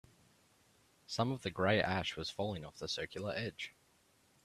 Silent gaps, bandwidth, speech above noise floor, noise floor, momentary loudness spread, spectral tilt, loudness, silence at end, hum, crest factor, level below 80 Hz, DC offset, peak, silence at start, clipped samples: none; 14 kHz; 33 dB; -71 dBFS; 11 LU; -5 dB/octave; -38 LUFS; 0.75 s; none; 24 dB; -68 dBFS; under 0.1%; -16 dBFS; 1.1 s; under 0.1%